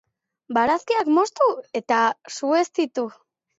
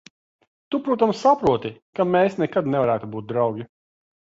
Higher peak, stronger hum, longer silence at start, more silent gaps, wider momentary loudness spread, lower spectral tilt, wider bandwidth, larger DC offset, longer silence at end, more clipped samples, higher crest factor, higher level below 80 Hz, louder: about the same, -6 dBFS vs -4 dBFS; neither; second, 0.5 s vs 0.7 s; second, none vs 1.82-1.93 s; about the same, 9 LU vs 10 LU; second, -3.5 dB/octave vs -7 dB/octave; about the same, 8 kHz vs 7.8 kHz; neither; about the same, 0.5 s vs 0.55 s; neither; about the same, 16 dB vs 18 dB; second, -66 dBFS vs -56 dBFS; about the same, -22 LUFS vs -22 LUFS